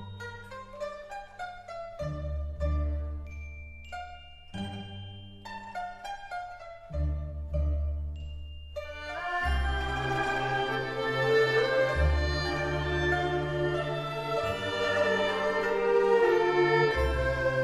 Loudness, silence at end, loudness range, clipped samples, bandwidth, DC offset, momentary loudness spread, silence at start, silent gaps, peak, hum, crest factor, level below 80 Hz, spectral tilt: -29 LUFS; 0 s; 12 LU; under 0.1%; 13 kHz; under 0.1%; 18 LU; 0 s; none; -14 dBFS; none; 16 dB; -38 dBFS; -6 dB/octave